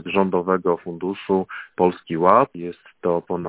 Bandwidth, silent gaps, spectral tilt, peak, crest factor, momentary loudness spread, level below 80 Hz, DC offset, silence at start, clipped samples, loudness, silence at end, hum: 4 kHz; none; -11 dB/octave; 0 dBFS; 22 dB; 12 LU; -56 dBFS; under 0.1%; 0.05 s; under 0.1%; -21 LUFS; 0 s; none